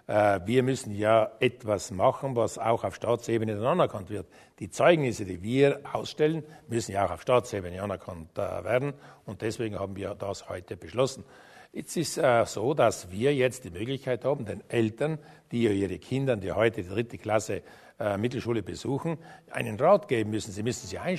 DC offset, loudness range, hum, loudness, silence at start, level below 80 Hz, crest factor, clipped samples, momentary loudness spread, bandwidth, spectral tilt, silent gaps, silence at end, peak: under 0.1%; 6 LU; none; -28 LUFS; 0.1 s; -60 dBFS; 22 dB; under 0.1%; 12 LU; 13.5 kHz; -5.5 dB/octave; none; 0 s; -6 dBFS